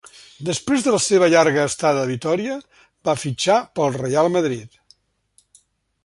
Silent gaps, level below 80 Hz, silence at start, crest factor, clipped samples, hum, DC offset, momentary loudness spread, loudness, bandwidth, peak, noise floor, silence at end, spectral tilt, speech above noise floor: none; -60 dBFS; 0.4 s; 18 dB; under 0.1%; none; under 0.1%; 12 LU; -19 LUFS; 11.5 kHz; -2 dBFS; -61 dBFS; 1.35 s; -4.5 dB/octave; 43 dB